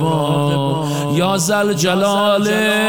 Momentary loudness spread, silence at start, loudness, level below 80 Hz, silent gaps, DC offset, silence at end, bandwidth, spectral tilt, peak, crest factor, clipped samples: 4 LU; 0 s; -16 LUFS; -56 dBFS; none; 0.4%; 0 s; 18 kHz; -4.5 dB/octave; -4 dBFS; 12 dB; under 0.1%